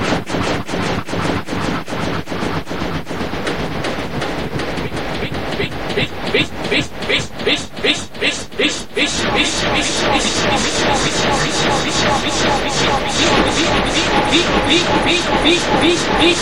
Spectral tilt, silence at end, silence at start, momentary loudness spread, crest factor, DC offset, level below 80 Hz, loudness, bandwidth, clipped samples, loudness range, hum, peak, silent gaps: -3.5 dB/octave; 0 s; 0 s; 9 LU; 18 dB; 4%; -34 dBFS; -16 LUFS; 16 kHz; under 0.1%; 8 LU; none; 0 dBFS; none